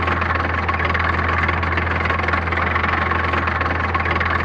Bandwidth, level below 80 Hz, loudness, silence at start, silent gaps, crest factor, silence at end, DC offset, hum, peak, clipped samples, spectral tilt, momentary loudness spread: 7 kHz; -30 dBFS; -19 LUFS; 0 s; none; 14 dB; 0 s; under 0.1%; none; -6 dBFS; under 0.1%; -7 dB/octave; 1 LU